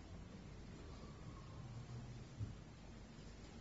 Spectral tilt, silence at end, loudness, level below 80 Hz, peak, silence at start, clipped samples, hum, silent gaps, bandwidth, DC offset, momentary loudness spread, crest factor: -6.5 dB/octave; 0 s; -55 LUFS; -60 dBFS; -36 dBFS; 0 s; under 0.1%; none; none; 7.6 kHz; under 0.1%; 6 LU; 18 dB